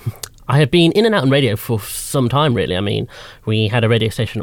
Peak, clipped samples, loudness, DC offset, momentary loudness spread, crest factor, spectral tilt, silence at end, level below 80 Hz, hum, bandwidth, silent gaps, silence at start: -2 dBFS; under 0.1%; -16 LUFS; under 0.1%; 11 LU; 14 dB; -5.5 dB/octave; 0 s; -44 dBFS; none; 18.5 kHz; none; 0.05 s